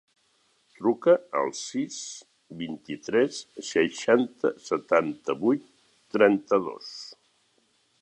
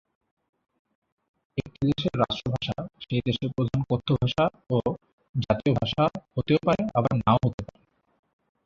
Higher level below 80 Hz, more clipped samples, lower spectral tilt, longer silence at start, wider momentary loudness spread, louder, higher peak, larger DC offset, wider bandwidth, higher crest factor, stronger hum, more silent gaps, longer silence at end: second, -72 dBFS vs -50 dBFS; neither; second, -4.5 dB/octave vs -8 dB/octave; second, 0.8 s vs 1.55 s; first, 17 LU vs 11 LU; about the same, -26 LUFS vs -26 LUFS; about the same, -6 dBFS vs -6 dBFS; neither; first, 9.8 kHz vs 7.4 kHz; about the same, 22 dB vs 22 dB; neither; second, none vs 5.13-5.18 s, 5.29-5.34 s, 7.54-7.58 s; about the same, 0.9 s vs 1 s